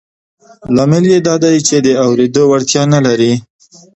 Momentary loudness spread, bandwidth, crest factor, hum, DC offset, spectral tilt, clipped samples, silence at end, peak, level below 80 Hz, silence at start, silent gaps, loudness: 3 LU; 8.4 kHz; 12 dB; none; under 0.1%; -5 dB/octave; under 0.1%; 0.55 s; 0 dBFS; -50 dBFS; 0.65 s; none; -11 LUFS